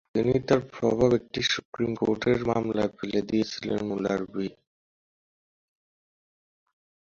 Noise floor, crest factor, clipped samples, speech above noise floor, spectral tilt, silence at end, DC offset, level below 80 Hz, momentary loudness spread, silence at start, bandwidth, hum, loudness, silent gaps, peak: under -90 dBFS; 20 dB; under 0.1%; over 64 dB; -5.5 dB/octave; 2.55 s; under 0.1%; -56 dBFS; 7 LU; 0.15 s; 7.6 kHz; none; -27 LUFS; 1.65-1.72 s; -8 dBFS